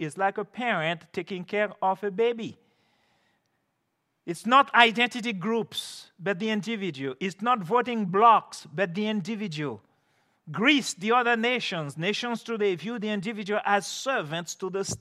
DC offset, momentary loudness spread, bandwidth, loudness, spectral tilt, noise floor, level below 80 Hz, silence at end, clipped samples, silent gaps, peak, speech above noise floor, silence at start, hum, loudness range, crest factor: under 0.1%; 14 LU; 14 kHz; -26 LUFS; -4 dB/octave; -77 dBFS; -74 dBFS; 0.05 s; under 0.1%; none; -2 dBFS; 51 dB; 0 s; none; 5 LU; 26 dB